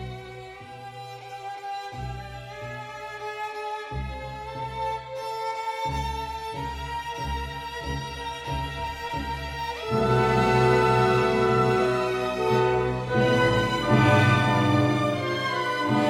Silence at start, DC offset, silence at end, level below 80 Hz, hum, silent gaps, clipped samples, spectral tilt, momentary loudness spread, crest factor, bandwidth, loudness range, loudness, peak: 0 s; under 0.1%; 0 s; -42 dBFS; none; none; under 0.1%; -6 dB/octave; 16 LU; 18 dB; 14.5 kHz; 13 LU; -25 LUFS; -8 dBFS